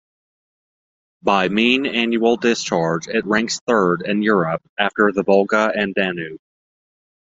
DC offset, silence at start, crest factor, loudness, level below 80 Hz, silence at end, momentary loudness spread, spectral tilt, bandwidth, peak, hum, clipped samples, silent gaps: under 0.1%; 1.25 s; 18 dB; -18 LUFS; -58 dBFS; 0.9 s; 6 LU; -4.5 dB/octave; 7.8 kHz; -2 dBFS; none; under 0.1%; 3.61-3.67 s, 4.69-4.76 s